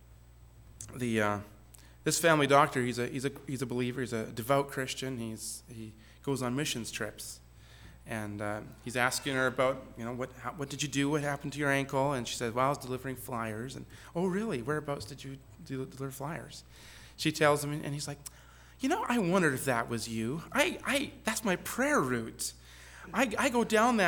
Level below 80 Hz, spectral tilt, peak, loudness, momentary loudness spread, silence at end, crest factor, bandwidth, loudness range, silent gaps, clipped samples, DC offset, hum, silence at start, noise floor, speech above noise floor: -58 dBFS; -4.5 dB/octave; -10 dBFS; -32 LUFS; 16 LU; 0 s; 24 dB; over 20 kHz; 7 LU; none; under 0.1%; under 0.1%; none; 0.1 s; -55 dBFS; 23 dB